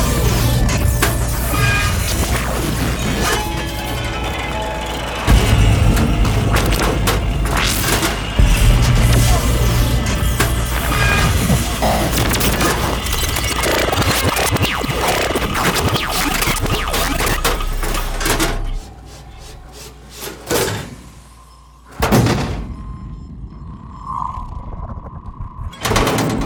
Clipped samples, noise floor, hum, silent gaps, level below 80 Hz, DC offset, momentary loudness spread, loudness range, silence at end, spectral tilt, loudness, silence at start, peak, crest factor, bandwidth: under 0.1%; -42 dBFS; none; none; -22 dBFS; under 0.1%; 18 LU; 7 LU; 0 s; -4 dB/octave; -17 LUFS; 0 s; 0 dBFS; 16 dB; over 20 kHz